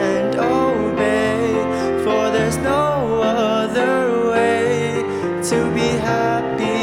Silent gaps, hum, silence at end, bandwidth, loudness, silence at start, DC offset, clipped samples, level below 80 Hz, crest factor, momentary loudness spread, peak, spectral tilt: none; none; 0 s; 16 kHz; -18 LUFS; 0 s; under 0.1%; under 0.1%; -46 dBFS; 12 dB; 3 LU; -6 dBFS; -5.5 dB/octave